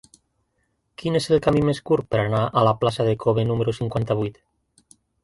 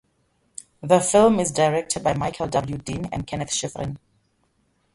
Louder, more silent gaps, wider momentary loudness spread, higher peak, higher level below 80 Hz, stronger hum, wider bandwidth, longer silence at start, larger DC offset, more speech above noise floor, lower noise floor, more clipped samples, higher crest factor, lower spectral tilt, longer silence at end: about the same, -22 LUFS vs -22 LUFS; neither; second, 6 LU vs 21 LU; second, -6 dBFS vs -2 dBFS; about the same, -50 dBFS vs -50 dBFS; neither; about the same, 11.5 kHz vs 11.5 kHz; first, 1 s vs 0.85 s; neither; first, 50 dB vs 45 dB; first, -71 dBFS vs -67 dBFS; neither; about the same, 18 dB vs 20 dB; first, -7 dB/octave vs -4.5 dB/octave; about the same, 0.95 s vs 0.95 s